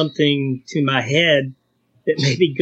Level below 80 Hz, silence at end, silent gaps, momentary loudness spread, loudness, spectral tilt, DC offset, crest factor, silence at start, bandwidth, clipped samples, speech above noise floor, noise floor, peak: -66 dBFS; 0 s; none; 8 LU; -18 LUFS; -5.5 dB/octave; under 0.1%; 16 dB; 0 s; 8 kHz; under 0.1%; 42 dB; -59 dBFS; -2 dBFS